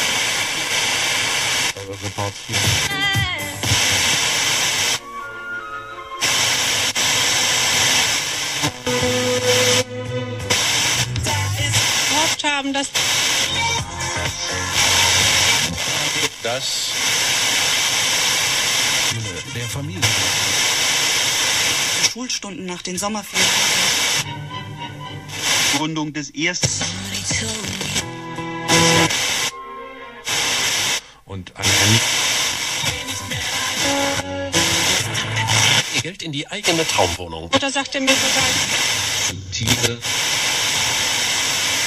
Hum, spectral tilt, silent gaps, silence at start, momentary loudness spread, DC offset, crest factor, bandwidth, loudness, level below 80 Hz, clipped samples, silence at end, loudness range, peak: none; -1.5 dB/octave; none; 0 s; 12 LU; under 0.1%; 20 dB; 15.5 kHz; -17 LUFS; -46 dBFS; under 0.1%; 0 s; 3 LU; 0 dBFS